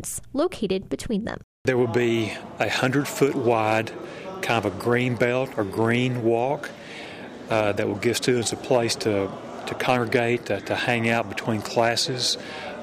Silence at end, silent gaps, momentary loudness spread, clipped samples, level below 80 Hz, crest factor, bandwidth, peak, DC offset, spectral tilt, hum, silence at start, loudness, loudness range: 0 s; 1.44-1.65 s; 11 LU; under 0.1%; -56 dBFS; 16 dB; 15.5 kHz; -8 dBFS; under 0.1%; -4.5 dB/octave; none; 0 s; -24 LUFS; 1 LU